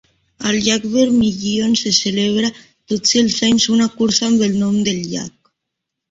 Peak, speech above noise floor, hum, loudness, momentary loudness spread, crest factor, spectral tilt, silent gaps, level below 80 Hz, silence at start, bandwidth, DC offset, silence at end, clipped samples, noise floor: 0 dBFS; 63 dB; none; -16 LUFS; 9 LU; 16 dB; -3.5 dB/octave; none; -50 dBFS; 0.4 s; 7.8 kHz; under 0.1%; 0.8 s; under 0.1%; -79 dBFS